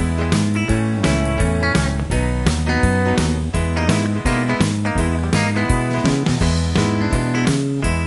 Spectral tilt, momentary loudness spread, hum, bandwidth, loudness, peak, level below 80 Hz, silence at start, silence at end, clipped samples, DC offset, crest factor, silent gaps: -5.5 dB/octave; 2 LU; none; 11.5 kHz; -18 LUFS; -2 dBFS; -26 dBFS; 0 s; 0 s; under 0.1%; under 0.1%; 16 dB; none